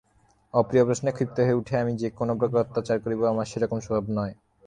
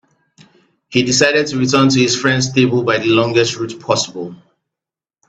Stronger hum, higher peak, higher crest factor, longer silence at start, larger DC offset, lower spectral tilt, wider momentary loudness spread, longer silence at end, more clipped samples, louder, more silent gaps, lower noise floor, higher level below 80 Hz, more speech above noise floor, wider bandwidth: neither; second, -6 dBFS vs 0 dBFS; about the same, 20 dB vs 16 dB; second, 0.55 s vs 0.9 s; neither; first, -7 dB/octave vs -4 dB/octave; second, 6 LU vs 9 LU; second, 0.35 s vs 0.95 s; neither; second, -26 LUFS vs -14 LUFS; neither; second, -63 dBFS vs -87 dBFS; about the same, -56 dBFS vs -54 dBFS; second, 38 dB vs 72 dB; first, 10 kHz vs 9 kHz